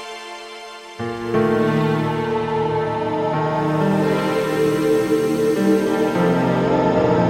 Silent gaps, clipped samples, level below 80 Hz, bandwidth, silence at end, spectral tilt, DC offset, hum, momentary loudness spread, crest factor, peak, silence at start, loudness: none; under 0.1%; -48 dBFS; 17 kHz; 0 s; -7 dB/octave; under 0.1%; none; 13 LU; 14 dB; -4 dBFS; 0 s; -19 LUFS